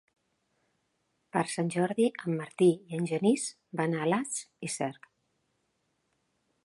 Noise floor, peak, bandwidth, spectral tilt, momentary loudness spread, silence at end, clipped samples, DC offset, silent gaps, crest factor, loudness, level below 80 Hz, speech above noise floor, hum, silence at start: -77 dBFS; -12 dBFS; 11.5 kHz; -5.5 dB/octave; 10 LU; 1.75 s; under 0.1%; under 0.1%; none; 20 dB; -30 LUFS; -78 dBFS; 48 dB; none; 1.35 s